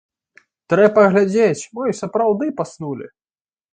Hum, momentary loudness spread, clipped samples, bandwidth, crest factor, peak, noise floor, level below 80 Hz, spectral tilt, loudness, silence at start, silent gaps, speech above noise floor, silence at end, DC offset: none; 15 LU; under 0.1%; 9.4 kHz; 18 dB; 0 dBFS; under -90 dBFS; -62 dBFS; -6.5 dB/octave; -17 LUFS; 0.7 s; none; over 73 dB; 0.65 s; under 0.1%